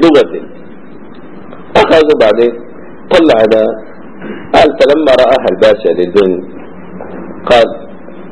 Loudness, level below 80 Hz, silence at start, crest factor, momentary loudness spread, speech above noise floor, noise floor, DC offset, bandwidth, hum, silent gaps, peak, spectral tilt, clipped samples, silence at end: -9 LUFS; -40 dBFS; 0 s; 10 dB; 21 LU; 25 dB; -32 dBFS; 4%; 11 kHz; none; none; 0 dBFS; -5.5 dB/octave; 2%; 0 s